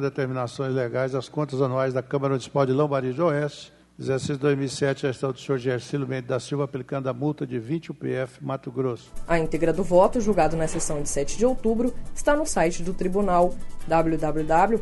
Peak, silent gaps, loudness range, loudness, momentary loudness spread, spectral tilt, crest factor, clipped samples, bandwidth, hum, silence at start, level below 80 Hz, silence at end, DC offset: -6 dBFS; none; 5 LU; -25 LUFS; 8 LU; -6 dB/octave; 18 dB; under 0.1%; 11.5 kHz; none; 0 s; -38 dBFS; 0 s; under 0.1%